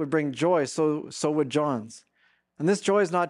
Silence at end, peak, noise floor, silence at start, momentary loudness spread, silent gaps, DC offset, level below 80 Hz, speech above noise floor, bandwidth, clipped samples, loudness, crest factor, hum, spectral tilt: 0 s; -10 dBFS; -67 dBFS; 0 s; 6 LU; none; under 0.1%; -74 dBFS; 42 dB; 11.5 kHz; under 0.1%; -26 LUFS; 16 dB; none; -5.5 dB/octave